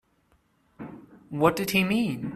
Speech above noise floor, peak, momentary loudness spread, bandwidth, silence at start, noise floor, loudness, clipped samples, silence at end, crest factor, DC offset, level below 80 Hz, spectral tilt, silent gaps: 42 dB; -6 dBFS; 20 LU; 15.5 kHz; 0.8 s; -67 dBFS; -24 LUFS; under 0.1%; 0 s; 22 dB; under 0.1%; -60 dBFS; -5.5 dB/octave; none